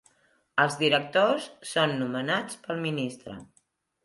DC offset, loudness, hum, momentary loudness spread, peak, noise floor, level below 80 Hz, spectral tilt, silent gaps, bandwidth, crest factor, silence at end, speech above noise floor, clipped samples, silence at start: under 0.1%; -27 LUFS; none; 12 LU; -8 dBFS; -69 dBFS; -70 dBFS; -4.5 dB/octave; none; 11.5 kHz; 22 dB; 0.6 s; 42 dB; under 0.1%; 0.55 s